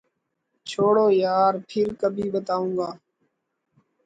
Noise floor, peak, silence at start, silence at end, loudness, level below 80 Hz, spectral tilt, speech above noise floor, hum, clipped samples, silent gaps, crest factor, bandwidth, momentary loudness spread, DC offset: -76 dBFS; -8 dBFS; 0.65 s; 1.1 s; -23 LUFS; -66 dBFS; -6.5 dB/octave; 54 dB; none; under 0.1%; none; 16 dB; 9 kHz; 12 LU; under 0.1%